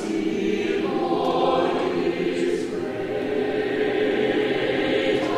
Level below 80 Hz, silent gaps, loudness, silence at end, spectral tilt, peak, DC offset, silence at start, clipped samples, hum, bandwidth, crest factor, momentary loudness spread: -54 dBFS; none; -23 LUFS; 0 s; -5.5 dB/octave; -10 dBFS; under 0.1%; 0 s; under 0.1%; none; 12 kHz; 14 dB; 5 LU